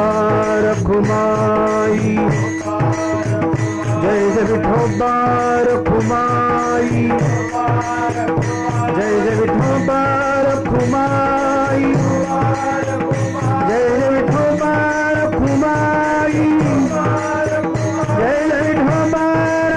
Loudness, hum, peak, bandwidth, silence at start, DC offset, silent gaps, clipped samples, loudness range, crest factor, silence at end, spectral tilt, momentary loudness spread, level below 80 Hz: -16 LUFS; none; -6 dBFS; 10.5 kHz; 0 s; under 0.1%; none; under 0.1%; 1 LU; 10 dB; 0 s; -7 dB/octave; 3 LU; -38 dBFS